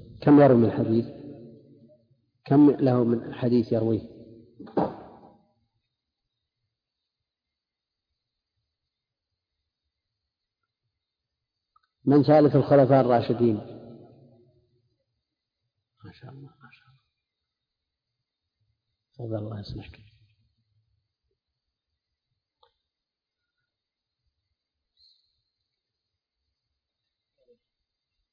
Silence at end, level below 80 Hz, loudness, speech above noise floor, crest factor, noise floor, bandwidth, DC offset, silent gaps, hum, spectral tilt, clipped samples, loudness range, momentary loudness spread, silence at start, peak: 8.5 s; -62 dBFS; -22 LUFS; 67 dB; 20 dB; -88 dBFS; 5.2 kHz; under 0.1%; none; none; -11 dB/octave; under 0.1%; 19 LU; 23 LU; 0.2 s; -8 dBFS